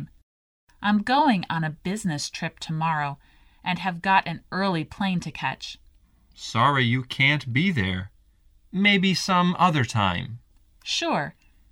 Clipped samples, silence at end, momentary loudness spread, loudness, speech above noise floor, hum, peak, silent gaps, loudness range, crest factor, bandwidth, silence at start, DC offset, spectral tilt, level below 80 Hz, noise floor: under 0.1%; 0.4 s; 15 LU; -24 LUFS; 34 dB; none; -6 dBFS; 0.23-0.67 s; 4 LU; 20 dB; 14 kHz; 0 s; under 0.1%; -5 dB/octave; -56 dBFS; -58 dBFS